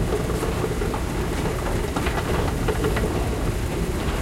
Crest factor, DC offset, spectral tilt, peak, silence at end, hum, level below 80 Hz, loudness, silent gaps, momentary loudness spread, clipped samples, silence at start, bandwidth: 14 dB; under 0.1%; -5.5 dB/octave; -8 dBFS; 0 s; none; -28 dBFS; -25 LUFS; none; 3 LU; under 0.1%; 0 s; 16 kHz